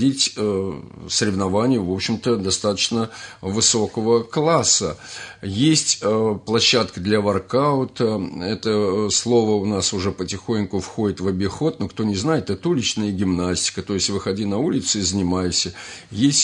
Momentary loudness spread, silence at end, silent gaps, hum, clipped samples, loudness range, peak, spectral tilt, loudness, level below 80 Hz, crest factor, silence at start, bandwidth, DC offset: 9 LU; 0 s; none; none; under 0.1%; 3 LU; -4 dBFS; -4 dB/octave; -20 LUFS; -54 dBFS; 16 dB; 0 s; 11 kHz; under 0.1%